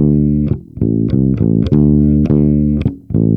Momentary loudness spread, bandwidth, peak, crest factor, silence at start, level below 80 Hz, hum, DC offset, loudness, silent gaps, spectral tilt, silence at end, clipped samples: 7 LU; 5 kHz; 0 dBFS; 12 dB; 0 s; -26 dBFS; none; under 0.1%; -13 LUFS; none; -12 dB/octave; 0 s; under 0.1%